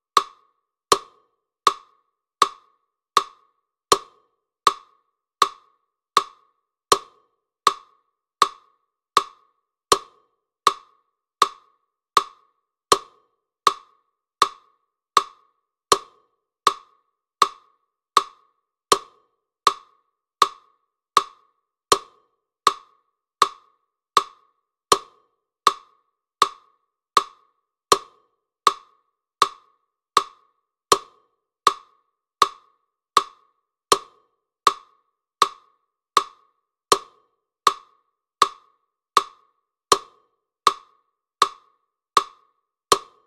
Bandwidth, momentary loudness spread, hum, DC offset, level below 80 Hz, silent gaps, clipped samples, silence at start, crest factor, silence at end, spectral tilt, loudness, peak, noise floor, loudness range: 16 kHz; 17 LU; none; under 0.1%; -64 dBFS; none; under 0.1%; 0.15 s; 26 dB; 0.25 s; -0.5 dB/octave; -23 LUFS; 0 dBFS; -69 dBFS; 0 LU